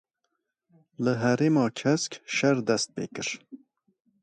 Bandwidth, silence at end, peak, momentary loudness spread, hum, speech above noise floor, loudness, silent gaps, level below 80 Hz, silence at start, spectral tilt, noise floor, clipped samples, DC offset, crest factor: 10.5 kHz; 0.65 s; -10 dBFS; 10 LU; none; 54 dB; -26 LUFS; none; -70 dBFS; 1 s; -5 dB/octave; -80 dBFS; under 0.1%; under 0.1%; 18 dB